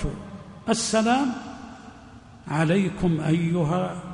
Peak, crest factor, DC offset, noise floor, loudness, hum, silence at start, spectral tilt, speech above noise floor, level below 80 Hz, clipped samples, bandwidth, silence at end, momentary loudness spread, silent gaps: -10 dBFS; 16 dB; under 0.1%; -46 dBFS; -24 LUFS; none; 0 s; -5.5 dB/octave; 23 dB; -44 dBFS; under 0.1%; 10.5 kHz; 0 s; 20 LU; none